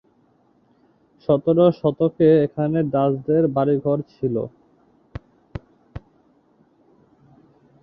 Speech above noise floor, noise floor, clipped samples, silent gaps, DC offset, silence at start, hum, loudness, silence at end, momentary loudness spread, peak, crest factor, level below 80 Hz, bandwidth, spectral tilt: 41 dB; -60 dBFS; under 0.1%; none; under 0.1%; 1.3 s; none; -20 LUFS; 1.85 s; 24 LU; -4 dBFS; 18 dB; -52 dBFS; 5.6 kHz; -11.5 dB/octave